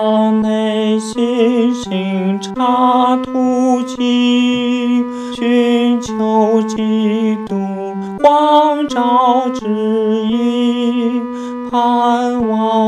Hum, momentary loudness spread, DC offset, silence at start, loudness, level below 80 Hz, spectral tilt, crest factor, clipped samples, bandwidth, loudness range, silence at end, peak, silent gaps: none; 7 LU; under 0.1%; 0 s; -14 LUFS; -52 dBFS; -6 dB/octave; 14 dB; under 0.1%; 10.5 kHz; 2 LU; 0 s; 0 dBFS; none